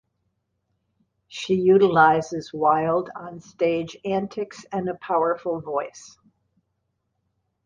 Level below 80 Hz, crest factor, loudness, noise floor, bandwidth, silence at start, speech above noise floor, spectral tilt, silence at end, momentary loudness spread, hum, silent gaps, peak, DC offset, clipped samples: -64 dBFS; 22 dB; -22 LUFS; -75 dBFS; 7.6 kHz; 1.3 s; 53 dB; -6 dB/octave; 1.6 s; 18 LU; none; none; -4 dBFS; under 0.1%; under 0.1%